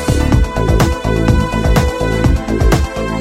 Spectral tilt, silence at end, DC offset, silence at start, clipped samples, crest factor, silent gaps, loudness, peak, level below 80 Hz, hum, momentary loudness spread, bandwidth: -6.5 dB/octave; 0 s; under 0.1%; 0 s; under 0.1%; 12 dB; none; -14 LUFS; 0 dBFS; -16 dBFS; none; 2 LU; 16 kHz